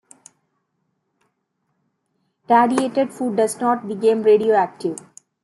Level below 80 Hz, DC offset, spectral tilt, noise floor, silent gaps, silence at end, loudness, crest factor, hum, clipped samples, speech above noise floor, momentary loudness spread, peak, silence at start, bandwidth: -72 dBFS; under 0.1%; -5 dB/octave; -72 dBFS; none; 0.45 s; -19 LUFS; 18 dB; none; under 0.1%; 55 dB; 10 LU; -2 dBFS; 2.5 s; 12 kHz